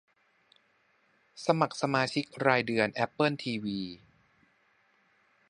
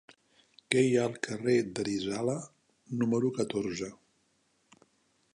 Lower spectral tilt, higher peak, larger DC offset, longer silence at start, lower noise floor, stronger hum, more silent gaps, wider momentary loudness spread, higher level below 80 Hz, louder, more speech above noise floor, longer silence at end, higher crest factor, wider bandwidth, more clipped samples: about the same, -5.5 dB/octave vs -5.5 dB/octave; about the same, -8 dBFS vs -8 dBFS; neither; first, 1.35 s vs 0.7 s; about the same, -70 dBFS vs -73 dBFS; neither; neither; about the same, 10 LU vs 12 LU; about the same, -72 dBFS vs -70 dBFS; about the same, -29 LUFS vs -31 LUFS; about the same, 40 dB vs 43 dB; first, 1.55 s vs 1.4 s; about the same, 24 dB vs 24 dB; about the same, 11.5 kHz vs 11 kHz; neither